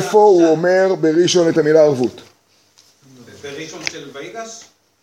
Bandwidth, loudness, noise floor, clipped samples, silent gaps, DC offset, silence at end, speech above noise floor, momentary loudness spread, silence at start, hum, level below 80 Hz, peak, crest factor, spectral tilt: 13.5 kHz; -14 LUFS; -55 dBFS; under 0.1%; none; under 0.1%; 0.45 s; 41 dB; 20 LU; 0 s; none; -66 dBFS; 0 dBFS; 16 dB; -5 dB/octave